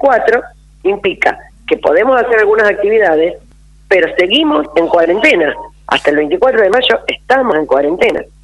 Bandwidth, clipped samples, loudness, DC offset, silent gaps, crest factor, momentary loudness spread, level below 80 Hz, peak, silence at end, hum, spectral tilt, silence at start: 11.5 kHz; under 0.1%; -11 LUFS; under 0.1%; none; 12 dB; 7 LU; -42 dBFS; 0 dBFS; 0.2 s; none; -4.5 dB/octave; 0 s